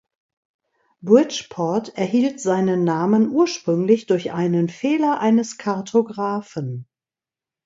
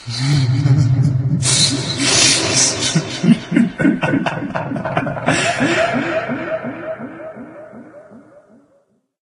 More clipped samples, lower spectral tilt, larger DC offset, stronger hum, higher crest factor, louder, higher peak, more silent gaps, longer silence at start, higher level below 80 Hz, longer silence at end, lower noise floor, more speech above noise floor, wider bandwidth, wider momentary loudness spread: neither; first, -6.5 dB/octave vs -4 dB/octave; neither; neither; about the same, 18 dB vs 18 dB; second, -20 LUFS vs -15 LUFS; about the same, -2 dBFS vs 0 dBFS; neither; first, 1.05 s vs 0 s; second, -68 dBFS vs -46 dBFS; second, 0.8 s vs 1.05 s; first, under -90 dBFS vs -59 dBFS; first, over 71 dB vs 42 dB; second, 7.8 kHz vs 11.5 kHz; second, 9 LU vs 16 LU